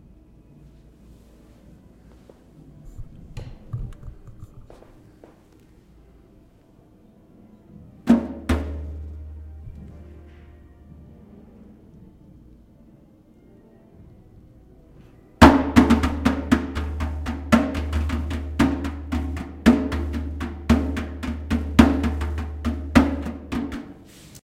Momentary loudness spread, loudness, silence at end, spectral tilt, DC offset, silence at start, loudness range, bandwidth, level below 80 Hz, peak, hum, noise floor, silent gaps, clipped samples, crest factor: 25 LU; -22 LUFS; 0.1 s; -6.5 dB/octave; under 0.1%; 1.1 s; 22 LU; 16 kHz; -32 dBFS; 0 dBFS; none; -53 dBFS; none; under 0.1%; 24 dB